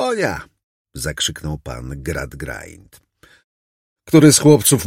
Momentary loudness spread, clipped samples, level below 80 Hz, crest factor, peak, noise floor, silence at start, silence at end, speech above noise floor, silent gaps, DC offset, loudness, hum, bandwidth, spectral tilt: 20 LU; under 0.1%; -40 dBFS; 18 dB; 0 dBFS; under -90 dBFS; 0 s; 0 s; over 74 dB; 0.63-0.85 s, 3.44-3.96 s; under 0.1%; -15 LUFS; none; 16.5 kHz; -4.5 dB/octave